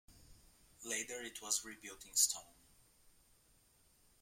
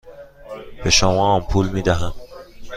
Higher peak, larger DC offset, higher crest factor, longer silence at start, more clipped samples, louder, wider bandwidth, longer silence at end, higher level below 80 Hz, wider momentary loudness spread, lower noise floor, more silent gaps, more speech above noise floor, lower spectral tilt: second, -14 dBFS vs -2 dBFS; neither; first, 30 dB vs 18 dB; about the same, 0.1 s vs 0.05 s; neither; second, -37 LUFS vs -18 LUFS; first, 16.5 kHz vs 14.5 kHz; first, 1.7 s vs 0 s; second, -72 dBFS vs -32 dBFS; second, 18 LU vs 22 LU; first, -71 dBFS vs -38 dBFS; neither; first, 30 dB vs 21 dB; second, 1 dB/octave vs -4 dB/octave